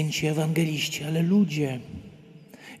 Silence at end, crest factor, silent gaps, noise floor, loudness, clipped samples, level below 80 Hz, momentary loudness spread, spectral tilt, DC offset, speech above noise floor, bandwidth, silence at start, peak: 0 s; 14 dB; none; -49 dBFS; -25 LUFS; under 0.1%; -60 dBFS; 21 LU; -5.5 dB/octave; under 0.1%; 24 dB; 14.5 kHz; 0 s; -12 dBFS